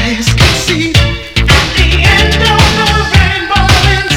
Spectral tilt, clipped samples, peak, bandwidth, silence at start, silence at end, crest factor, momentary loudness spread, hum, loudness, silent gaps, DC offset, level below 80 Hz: -4 dB/octave; 1%; 0 dBFS; 18 kHz; 0 s; 0 s; 8 dB; 4 LU; none; -8 LUFS; none; 0.8%; -16 dBFS